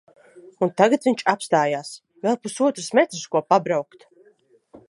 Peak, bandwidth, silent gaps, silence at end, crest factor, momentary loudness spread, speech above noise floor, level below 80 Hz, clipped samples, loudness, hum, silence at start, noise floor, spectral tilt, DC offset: -2 dBFS; 11.5 kHz; none; 0.1 s; 22 dB; 9 LU; 37 dB; -76 dBFS; under 0.1%; -21 LUFS; none; 0.35 s; -58 dBFS; -4.5 dB/octave; under 0.1%